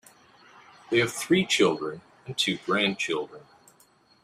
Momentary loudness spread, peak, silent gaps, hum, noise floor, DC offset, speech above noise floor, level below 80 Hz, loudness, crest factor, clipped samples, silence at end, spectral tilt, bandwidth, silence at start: 13 LU; -8 dBFS; none; none; -61 dBFS; under 0.1%; 35 dB; -68 dBFS; -25 LUFS; 20 dB; under 0.1%; 0.85 s; -3.5 dB/octave; 15.5 kHz; 0.9 s